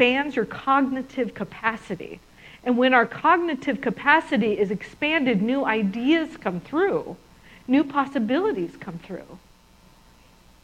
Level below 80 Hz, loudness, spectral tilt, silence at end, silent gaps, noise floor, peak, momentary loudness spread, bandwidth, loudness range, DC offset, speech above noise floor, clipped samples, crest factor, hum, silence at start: -58 dBFS; -23 LUFS; -6.5 dB/octave; 1.25 s; none; -54 dBFS; -2 dBFS; 17 LU; 10 kHz; 5 LU; under 0.1%; 31 dB; under 0.1%; 22 dB; none; 0 s